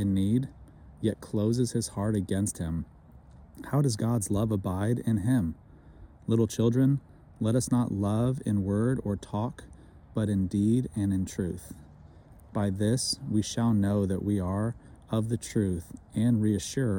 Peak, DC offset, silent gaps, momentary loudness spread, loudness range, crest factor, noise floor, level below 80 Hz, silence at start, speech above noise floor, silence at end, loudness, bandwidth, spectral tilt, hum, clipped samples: -12 dBFS; under 0.1%; none; 10 LU; 3 LU; 16 dB; -52 dBFS; -52 dBFS; 0 s; 24 dB; 0 s; -29 LUFS; 17.5 kHz; -6.5 dB/octave; none; under 0.1%